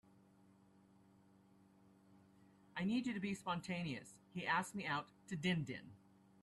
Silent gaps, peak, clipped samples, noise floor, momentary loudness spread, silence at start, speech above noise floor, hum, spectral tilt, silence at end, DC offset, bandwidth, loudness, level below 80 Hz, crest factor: none; -26 dBFS; under 0.1%; -69 dBFS; 12 LU; 2.1 s; 27 dB; none; -5 dB/octave; 0.45 s; under 0.1%; 12.5 kHz; -43 LUFS; -78 dBFS; 20 dB